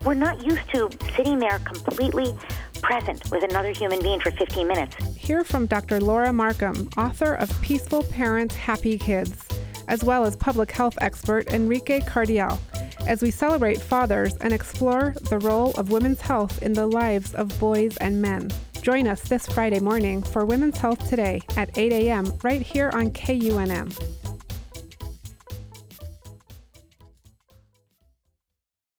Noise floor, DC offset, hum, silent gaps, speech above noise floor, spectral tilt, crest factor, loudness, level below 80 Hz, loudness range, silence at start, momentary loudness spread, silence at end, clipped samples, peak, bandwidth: -85 dBFS; under 0.1%; none; none; 62 dB; -6 dB/octave; 16 dB; -24 LUFS; -36 dBFS; 4 LU; 0 s; 11 LU; 1.9 s; under 0.1%; -8 dBFS; over 20 kHz